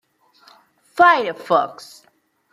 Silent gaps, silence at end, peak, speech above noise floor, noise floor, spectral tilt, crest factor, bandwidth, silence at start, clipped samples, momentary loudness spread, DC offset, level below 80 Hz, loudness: none; 0.8 s; -2 dBFS; 44 dB; -61 dBFS; -4 dB/octave; 20 dB; 13 kHz; 0.95 s; under 0.1%; 20 LU; under 0.1%; -68 dBFS; -17 LUFS